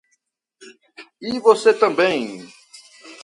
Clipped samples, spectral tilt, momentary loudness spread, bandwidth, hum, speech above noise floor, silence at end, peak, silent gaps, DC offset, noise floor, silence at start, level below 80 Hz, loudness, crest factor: under 0.1%; -4 dB/octave; 18 LU; 11.5 kHz; none; 53 dB; 0.1 s; 0 dBFS; none; under 0.1%; -70 dBFS; 0.6 s; -66 dBFS; -17 LUFS; 20 dB